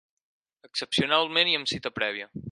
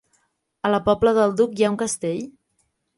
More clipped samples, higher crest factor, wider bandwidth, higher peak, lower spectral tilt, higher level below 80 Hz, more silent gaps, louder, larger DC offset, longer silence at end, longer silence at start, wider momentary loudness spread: neither; about the same, 22 dB vs 18 dB; about the same, 11.5 kHz vs 11.5 kHz; about the same, -6 dBFS vs -4 dBFS; second, -3.5 dB/octave vs -5 dB/octave; second, -62 dBFS vs -52 dBFS; neither; second, -25 LUFS vs -21 LUFS; neither; second, 0 s vs 0.65 s; about the same, 0.75 s vs 0.65 s; about the same, 12 LU vs 10 LU